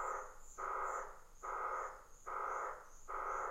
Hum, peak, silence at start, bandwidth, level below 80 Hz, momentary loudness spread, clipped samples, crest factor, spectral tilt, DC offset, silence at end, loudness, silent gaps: none; -30 dBFS; 0 s; 16 kHz; -60 dBFS; 11 LU; under 0.1%; 16 dB; -3 dB/octave; under 0.1%; 0 s; -44 LUFS; none